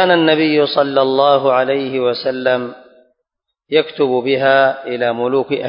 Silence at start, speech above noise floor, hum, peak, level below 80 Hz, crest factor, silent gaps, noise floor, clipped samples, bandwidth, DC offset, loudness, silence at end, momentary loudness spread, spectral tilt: 0 s; 61 dB; none; 0 dBFS; -64 dBFS; 16 dB; none; -76 dBFS; under 0.1%; 5.4 kHz; under 0.1%; -15 LUFS; 0 s; 6 LU; -9 dB/octave